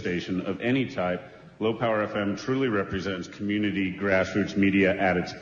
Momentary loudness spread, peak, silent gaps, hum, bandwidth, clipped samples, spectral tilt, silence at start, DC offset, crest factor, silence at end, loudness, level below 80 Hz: 8 LU; -10 dBFS; none; none; 7.4 kHz; under 0.1%; -6.5 dB/octave; 0 s; under 0.1%; 16 dB; 0 s; -26 LUFS; -58 dBFS